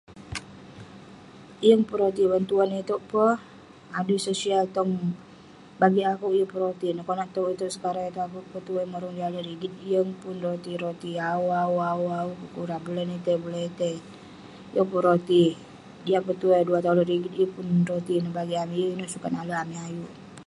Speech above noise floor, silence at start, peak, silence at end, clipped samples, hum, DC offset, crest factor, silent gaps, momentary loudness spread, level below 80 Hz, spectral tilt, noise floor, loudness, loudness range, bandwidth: 23 dB; 0.1 s; -4 dBFS; 0.05 s; under 0.1%; none; under 0.1%; 22 dB; none; 16 LU; -64 dBFS; -6.5 dB/octave; -49 dBFS; -26 LUFS; 6 LU; 11.5 kHz